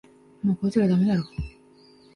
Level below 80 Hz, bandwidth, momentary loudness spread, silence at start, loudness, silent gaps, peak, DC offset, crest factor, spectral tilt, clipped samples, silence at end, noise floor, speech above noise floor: -46 dBFS; 10.5 kHz; 15 LU; 0.45 s; -24 LUFS; none; -10 dBFS; under 0.1%; 16 dB; -8.5 dB/octave; under 0.1%; 0.65 s; -54 dBFS; 32 dB